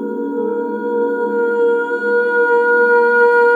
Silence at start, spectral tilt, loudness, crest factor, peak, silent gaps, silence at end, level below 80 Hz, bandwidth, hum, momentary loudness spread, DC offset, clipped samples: 0 s; -6.5 dB/octave; -15 LUFS; 12 dB; -2 dBFS; none; 0 s; -82 dBFS; 4.6 kHz; none; 9 LU; under 0.1%; under 0.1%